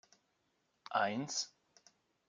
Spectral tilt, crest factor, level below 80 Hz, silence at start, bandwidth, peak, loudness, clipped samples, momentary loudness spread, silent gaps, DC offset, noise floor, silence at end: -2.5 dB/octave; 24 dB; under -90 dBFS; 0.9 s; 10 kHz; -18 dBFS; -38 LUFS; under 0.1%; 12 LU; none; under 0.1%; -80 dBFS; 0.8 s